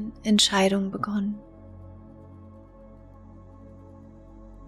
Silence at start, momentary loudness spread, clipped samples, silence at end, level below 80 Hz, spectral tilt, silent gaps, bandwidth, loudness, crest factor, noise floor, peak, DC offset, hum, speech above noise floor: 0 s; 28 LU; under 0.1%; 0 s; -52 dBFS; -3.5 dB/octave; none; 14 kHz; -23 LUFS; 22 dB; -48 dBFS; -8 dBFS; under 0.1%; none; 24 dB